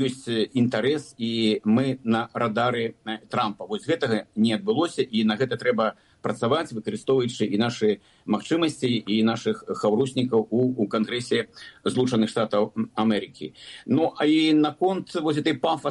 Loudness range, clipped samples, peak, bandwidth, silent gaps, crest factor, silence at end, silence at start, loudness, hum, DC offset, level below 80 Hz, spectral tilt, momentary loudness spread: 2 LU; under 0.1%; -8 dBFS; 11.5 kHz; none; 14 dB; 0 s; 0 s; -24 LUFS; none; under 0.1%; -66 dBFS; -6 dB/octave; 7 LU